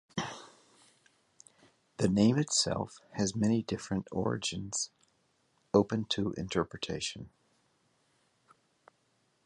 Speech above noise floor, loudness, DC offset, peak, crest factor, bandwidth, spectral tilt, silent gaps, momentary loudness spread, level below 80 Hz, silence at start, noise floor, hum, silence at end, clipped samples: 42 dB; -32 LUFS; under 0.1%; -12 dBFS; 22 dB; 11 kHz; -4.5 dB/octave; none; 13 LU; -60 dBFS; 0.15 s; -74 dBFS; none; 2.15 s; under 0.1%